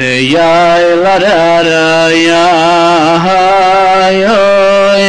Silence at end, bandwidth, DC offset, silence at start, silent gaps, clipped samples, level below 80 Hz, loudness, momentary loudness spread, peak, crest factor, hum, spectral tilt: 0 s; 11 kHz; under 0.1%; 0 s; none; under 0.1%; -42 dBFS; -7 LUFS; 1 LU; -2 dBFS; 4 dB; none; -4.5 dB/octave